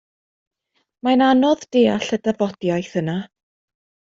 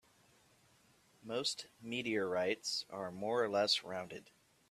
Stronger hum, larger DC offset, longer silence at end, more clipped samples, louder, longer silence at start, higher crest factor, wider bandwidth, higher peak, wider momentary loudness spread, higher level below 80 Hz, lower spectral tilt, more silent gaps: neither; neither; first, 0.9 s vs 0.5 s; neither; first, -19 LUFS vs -37 LUFS; second, 1.05 s vs 1.25 s; about the same, 16 dB vs 20 dB; second, 7.6 kHz vs 14 kHz; first, -4 dBFS vs -20 dBFS; about the same, 10 LU vs 12 LU; first, -62 dBFS vs -80 dBFS; first, -6 dB/octave vs -3 dB/octave; neither